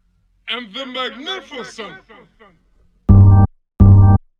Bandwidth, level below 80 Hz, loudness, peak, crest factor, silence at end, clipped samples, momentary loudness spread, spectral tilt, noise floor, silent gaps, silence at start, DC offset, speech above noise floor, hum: 5.6 kHz; -24 dBFS; -13 LUFS; 0 dBFS; 14 dB; 0.2 s; 0.1%; 22 LU; -8 dB/octave; -55 dBFS; none; 0.5 s; under 0.1%; 27 dB; none